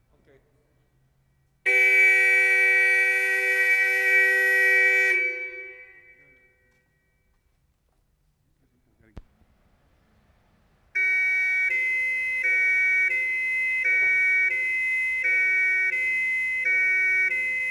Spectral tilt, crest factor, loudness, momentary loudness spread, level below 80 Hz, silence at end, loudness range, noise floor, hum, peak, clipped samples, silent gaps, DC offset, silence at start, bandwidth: -1 dB/octave; 14 dB; -20 LUFS; 6 LU; -64 dBFS; 0 s; 9 LU; -68 dBFS; none; -10 dBFS; under 0.1%; none; under 0.1%; 1.65 s; 14.5 kHz